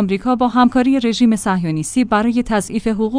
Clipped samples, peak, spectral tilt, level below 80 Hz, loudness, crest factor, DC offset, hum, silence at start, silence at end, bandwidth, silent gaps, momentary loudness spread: under 0.1%; -2 dBFS; -5.5 dB/octave; -42 dBFS; -16 LUFS; 14 dB; under 0.1%; none; 0 s; 0 s; 10.5 kHz; none; 6 LU